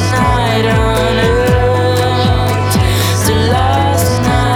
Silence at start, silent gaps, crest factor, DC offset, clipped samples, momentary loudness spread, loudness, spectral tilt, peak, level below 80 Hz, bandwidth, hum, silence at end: 0 s; none; 10 dB; under 0.1%; under 0.1%; 1 LU; -12 LUFS; -5.5 dB/octave; 0 dBFS; -22 dBFS; 18 kHz; none; 0 s